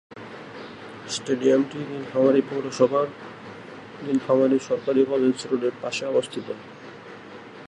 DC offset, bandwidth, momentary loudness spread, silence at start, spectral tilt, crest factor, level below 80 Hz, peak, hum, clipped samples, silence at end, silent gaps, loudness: under 0.1%; 11 kHz; 21 LU; 0.1 s; -5.5 dB/octave; 18 dB; -70 dBFS; -6 dBFS; none; under 0.1%; 0 s; none; -23 LUFS